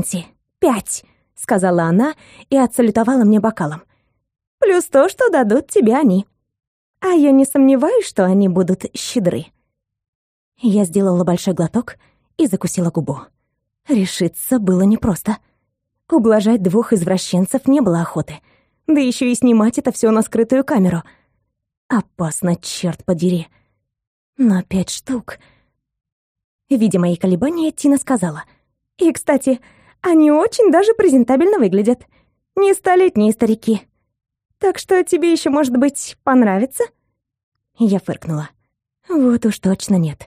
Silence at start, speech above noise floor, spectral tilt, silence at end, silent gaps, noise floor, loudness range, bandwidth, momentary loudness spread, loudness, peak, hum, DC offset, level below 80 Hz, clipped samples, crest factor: 0 s; 58 dB; -6 dB/octave; 0 s; 4.47-4.58 s, 6.67-6.94 s, 10.08-10.52 s, 21.77-21.89 s, 24.07-24.33 s, 26.12-26.35 s, 26.44-26.59 s, 37.43-37.52 s; -73 dBFS; 6 LU; 15.5 kHz; 11 LU; -16 LUFS; -2 dBFS; none; under 0.1%; -52 dBFS; under 0.1%; 14 dB